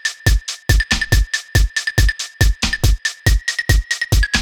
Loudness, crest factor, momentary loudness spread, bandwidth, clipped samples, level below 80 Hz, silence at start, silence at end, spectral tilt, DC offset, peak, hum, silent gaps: -17 LUFS; 16 dB; 2 LU; 18.5 kHz; under 0.1%; -18 dBFS; 0.05 s; 0 s; -3.5 dB/octave; under 0.1%; 0 dBFS; none; none